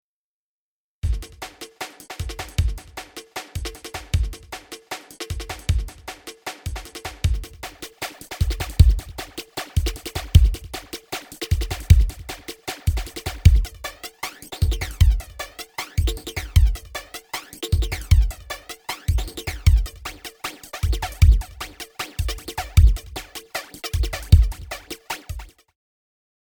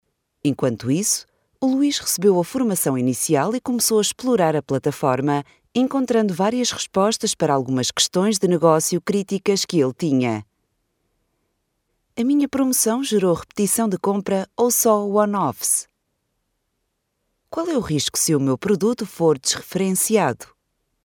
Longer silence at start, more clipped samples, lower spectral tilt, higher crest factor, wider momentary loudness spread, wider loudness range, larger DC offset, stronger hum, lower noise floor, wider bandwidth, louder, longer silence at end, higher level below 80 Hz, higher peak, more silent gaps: first, 1.05 s vs 0.45 s; neither; about the same, -5 dB/octave vs -4 dB/octave; about the same, 22 dB vs 18 dB; first, 17 LU vs 6 LU; first, 7 LU vs 4 LU; neither; neither; first, under -90 dBFS vs -74 dBFS; about the same, over 20 kHz vs 19.5 kHz; second, -24 LUFS vs -20 LUFS; first, 1.1 s vs 0.6 s; first, -24 dBFS vs -58 dBFS; about the same, 0 dBFS vs -2 dBFS; neither